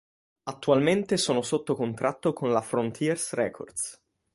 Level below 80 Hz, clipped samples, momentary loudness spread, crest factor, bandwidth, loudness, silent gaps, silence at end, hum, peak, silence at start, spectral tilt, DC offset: -66 dBFS; under 0.1%; 10 LU; 20 dB; 11.5 kHz; -27 LUFS; none; 0.4 s; none; -8 dBFS; 0.45 s; -4.5 dB/octave; under 0.1%